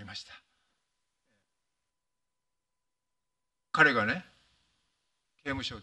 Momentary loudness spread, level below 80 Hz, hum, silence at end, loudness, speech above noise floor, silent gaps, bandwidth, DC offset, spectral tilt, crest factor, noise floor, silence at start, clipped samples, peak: 19 LU; -64 dBFS; none; 0 s; -28 LUFS; 59 dB; none; 11 kHz; under 0.1%; -4.5 dB/octave; 28 dB; -88 dBFS; 0 s; under 0.1%; -8 dBFS